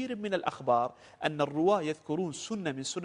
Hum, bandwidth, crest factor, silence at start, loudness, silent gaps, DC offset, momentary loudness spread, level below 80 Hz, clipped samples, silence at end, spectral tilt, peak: none; 10.5 kHz; 18 dB; 0 s; -31 LUFS; none; under 0.1%; 7 LU; -72 dBFS; under 0.1%; 0 s; -5 dB/octave; -12 dBFS